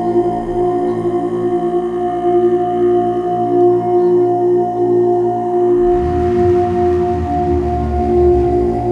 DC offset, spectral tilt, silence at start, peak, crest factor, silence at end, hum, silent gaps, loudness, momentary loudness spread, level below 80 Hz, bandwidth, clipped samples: under 0.1%; -9.5 dB/octave; 0 s; -2 dBFS; 12 dB; 0 s; 60 Hz at -50 dBFS; none; -14 LUFS; 5 LU; -30 dBFS; 4.1 kHz; under 0.1%